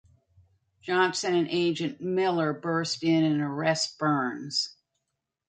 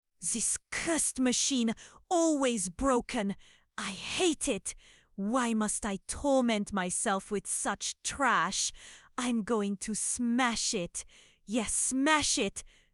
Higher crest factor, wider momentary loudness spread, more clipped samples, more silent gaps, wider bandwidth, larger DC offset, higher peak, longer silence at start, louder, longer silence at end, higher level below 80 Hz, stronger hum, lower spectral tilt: about the same, 16 dB vs 20 dB; second, 5 LU vs 11 LU; neither; neither; second, 9.4 kHz vs 12.5 kHz; neither; about the same, -12 dBFS vs -12 dBFS; first, 0.85 s vs 0.2 s; first, -27 LUFS vs -30 LUFS; first, 0.8 s vs 0.25 s; second, -72 dBFS vs -56 dBFS; neither; first, -4.5 dB/octave vs -2.5 dB/octave